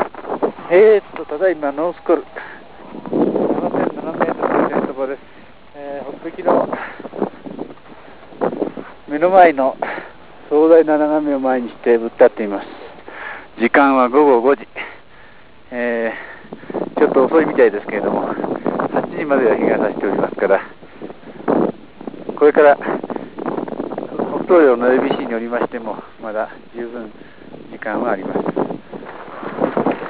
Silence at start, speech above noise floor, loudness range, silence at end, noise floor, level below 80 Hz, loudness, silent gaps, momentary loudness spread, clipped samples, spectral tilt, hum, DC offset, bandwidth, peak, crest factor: 0 s; 30 dB; 8 LU; 0 s; -45 dBFS; -56 dBFS; -17 LUFS; none; 20 LU; under 0.1%; -10 dB/octave; none; 0.7%; 4 kHz; 0 dBFS; 18 dB